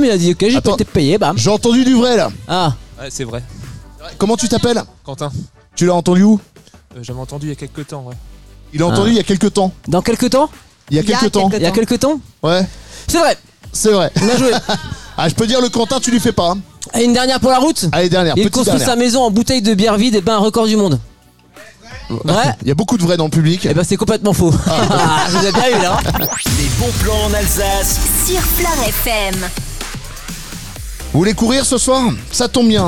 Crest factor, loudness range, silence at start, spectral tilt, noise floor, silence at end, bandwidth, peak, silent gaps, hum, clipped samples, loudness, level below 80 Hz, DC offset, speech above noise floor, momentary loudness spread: 12 dB; 4 LU; 0 s; -4.5 dB/octave; -44 dBFS; 0 s; 19 kHz; -2 dBFS; none; none; under 0.1%; -14 LUFS; -30 dBFS; 2%; 31 dB; 15 LU